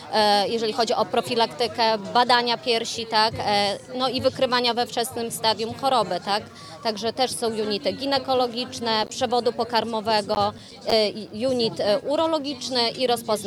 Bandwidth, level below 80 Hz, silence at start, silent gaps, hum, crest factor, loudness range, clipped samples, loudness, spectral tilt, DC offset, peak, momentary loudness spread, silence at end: 16.5 kHz; -62 dBFS; 0 s; none; none; 18 dB; 3 LU; under 0.1%; -23 LUFS; -3 dB/octave; under 0.1%; -6 dBFS; 6 LU; 0 s